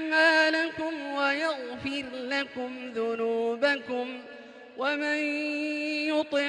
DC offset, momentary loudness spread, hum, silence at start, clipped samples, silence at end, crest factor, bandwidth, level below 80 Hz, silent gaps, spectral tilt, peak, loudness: under 0.1%; 12 LU; none; 0 s; under 0.1%; 0 s; 18 dB; 11 kHz; -70 dBFS; none; -3 dB/octave; -10 dBFS; -28 LUFS